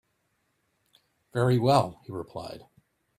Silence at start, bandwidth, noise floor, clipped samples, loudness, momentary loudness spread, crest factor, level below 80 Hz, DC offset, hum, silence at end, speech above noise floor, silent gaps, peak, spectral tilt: 1.35 s; 14.5 kHz; -74 dBFS; under 0.1%; -26 LUFS; 19 LU; 22 dB; -62 dBFS; under 0.1%; none; 0.6 s; 48 dB; none; -6 dBFS; -7 dB/octave